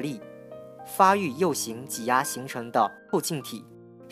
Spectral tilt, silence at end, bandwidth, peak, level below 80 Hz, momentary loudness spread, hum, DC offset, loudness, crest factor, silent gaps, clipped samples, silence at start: -4 dB/octave; 0 s; 15.5 kHz; -6 dBFS; -76 dBFS; 22 LU; none; under 0.1%; -26 LUFS; 22 dB; none; under 0.1%; 0 s